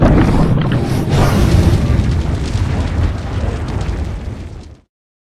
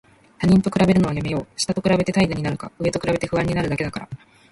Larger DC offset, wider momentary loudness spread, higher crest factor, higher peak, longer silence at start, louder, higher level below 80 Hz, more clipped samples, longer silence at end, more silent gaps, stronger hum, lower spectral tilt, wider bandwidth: neither; first, 13 LU vs 10 LU; about the same, 14 dB vs 16 dB; first, 0 dBFS vs -6 dBFS; second, 0 s vs 0.4 s; first, -15 LUFS vs -21 LUFS; first, -20 dBFS vs -44 dBFS; neither; first, 0.5 s vs 0.35 s; neither; neither; about the same, -7 dB/octave vs -6 dB/octave; first, 13.5 kHz vs 11.5 kHz